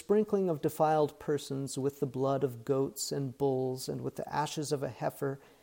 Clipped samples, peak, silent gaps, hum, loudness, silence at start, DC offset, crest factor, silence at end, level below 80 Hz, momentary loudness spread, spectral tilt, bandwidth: under 0.1%; -16 dBFS; none; none; -33 LUFS; 0.1 s; under 0.1%; 16 dB; 0.25 s; -68 dBFS; 8 LU; -5.5 dB/octave; 17 kHz